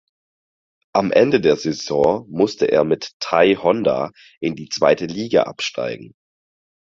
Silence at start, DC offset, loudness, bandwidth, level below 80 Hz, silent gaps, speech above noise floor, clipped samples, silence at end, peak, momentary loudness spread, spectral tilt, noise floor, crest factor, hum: 0.95 s; under 0.1%; -19 LUFS; 7.8 kHz; -56 dBFS; 3.13-3.20 s, 4.37-4.41 s; over 72 dB; under 0.1%; 0.75 s; 0 dBFS; 11 LU; -5 dB/octave; under -90 dBFS; 18 dB; none